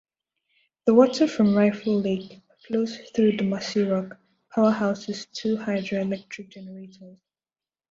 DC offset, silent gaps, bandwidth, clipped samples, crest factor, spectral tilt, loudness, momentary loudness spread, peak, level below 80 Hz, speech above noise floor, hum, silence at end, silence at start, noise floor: under 0.1%; none; 7.8 kHz; under 0.1%; 20 dB; -6.5 dB/octave; -24 LUFS; 19 LU; -4 dBFS; -66 dBFS; over 67 dB; none; 0.8 s; 0.85 s; under -90 dBFS